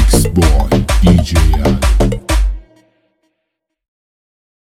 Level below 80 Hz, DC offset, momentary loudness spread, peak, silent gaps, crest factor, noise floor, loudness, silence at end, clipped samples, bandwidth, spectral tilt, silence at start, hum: -16 dBFS; under 0.1%; 6 LU; 0 dBFS; none; 12 dB; -74 dBFS; -13 LUFS; 2.05 s; under 0.1%; 15 kHz; -5.5 dB/octave; 0 s; none